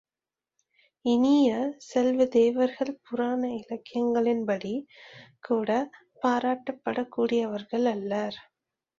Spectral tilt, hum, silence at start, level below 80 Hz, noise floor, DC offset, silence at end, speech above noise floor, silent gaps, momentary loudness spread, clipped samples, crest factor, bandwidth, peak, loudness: -6 dB/octave; none; 1.05 s; -70 dBFS; under -90 dBFS; under 0.1%; 0.6 s; over 64 dB; none; 12 LU; under 0.1%; 16 dB; 7.6 kHz; -10 dBFS; -27 LUFS